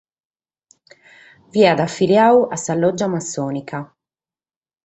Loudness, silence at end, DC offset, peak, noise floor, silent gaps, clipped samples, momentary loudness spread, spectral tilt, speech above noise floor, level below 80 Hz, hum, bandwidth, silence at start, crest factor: -17 LUFS; 1 s; under 0.1%; -2 dBFS; under -90 dBFS; none; under 0.1%; 13 LU; -5 dB/octave; over 74 dB; -60 dBFS; none; 8.2 kHz; 1.55 s; 18 dB